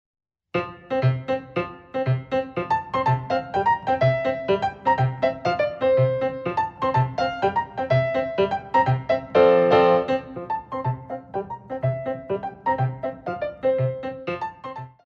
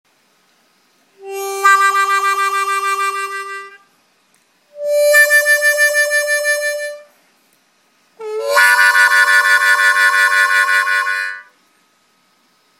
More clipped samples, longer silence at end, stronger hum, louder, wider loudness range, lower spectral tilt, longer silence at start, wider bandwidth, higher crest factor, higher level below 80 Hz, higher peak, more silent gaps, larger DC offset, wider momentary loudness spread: neither; second, 0.15 s vs 1.35 s; neither; second, -23 LUFS vs -12 LUFS; about the same, 7 LU vs 5 LU; first, -8 dB/octave vs 3 dB/octave; second, 0.55 s vs 1.2 s; second, 7 kHz vs 17 kHz; about the same, 20 dB vs 16 dB; first, -54 dBFS vs -86 dBFS; second, -4 dBFS vs 0 dBFS; neither; neither; second, 11 LU vs 17 LU